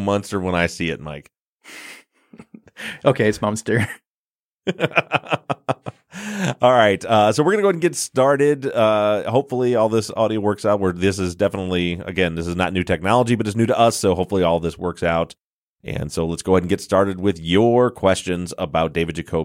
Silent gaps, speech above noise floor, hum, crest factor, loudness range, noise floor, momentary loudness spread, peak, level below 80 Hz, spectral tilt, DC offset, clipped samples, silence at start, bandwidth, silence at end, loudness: 1.39-1.58 s, 4.07-4.59 s, 15.41-15.76 s; over 71 dB; none; 18 dB; 6 LU; under -90 dBFS; 13 LU; -2 dBFS; -46 dBFS; -5.5 dB/octave; under 0.1%; under 0.1%; 0 s; 16.5 kHz; 0 s; -19 LUFS